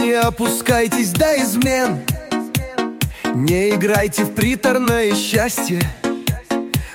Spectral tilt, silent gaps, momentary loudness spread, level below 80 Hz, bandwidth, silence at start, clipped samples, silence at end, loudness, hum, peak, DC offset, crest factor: -4.5 dB/octave; none; 7 LU; -36 dBFS; 17 kHz; 0 s; under 0.1%; 0 s; -18 LUFS; none; -2 dBFS; under 0.1%; 16 dB